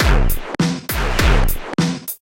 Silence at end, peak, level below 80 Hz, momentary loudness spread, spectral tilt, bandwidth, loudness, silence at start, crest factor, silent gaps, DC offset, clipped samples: 0.25 s; 0 dBFS; -18 dBFS; 5 LU; -5 dB/octave; 17 kHz; -19 LUFS; 0 s; 16 dB; none; under 0.1%; under 0.1%